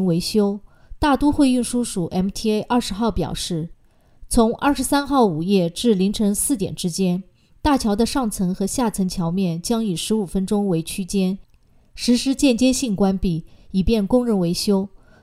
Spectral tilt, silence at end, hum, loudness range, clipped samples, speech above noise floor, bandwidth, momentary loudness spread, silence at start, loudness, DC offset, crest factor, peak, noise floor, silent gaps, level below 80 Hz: -5.5 dB/octave; 0.35 s; none; 3 LU; under 0.1%; 30 dB; 16 kHz; 7 LU; 0 s; -20 LUFS; under 0.1%; 16 dB; -4 dBFS; -49 dBFS; none; -38 dBFS